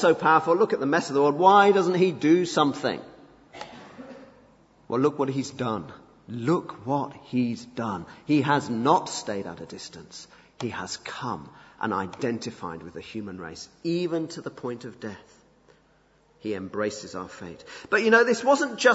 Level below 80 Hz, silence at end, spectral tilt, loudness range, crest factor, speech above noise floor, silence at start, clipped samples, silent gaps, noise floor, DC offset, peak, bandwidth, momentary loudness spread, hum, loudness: -66 dBFS; 0 s; -5 dB/octave; 12 LU; 22 dB; 37 dB; 0 s; under 0.1%; none; -62 dBFS; under 0.1%; -2 dBFS; 8 kHz; 20 LU; none; -25 LUFS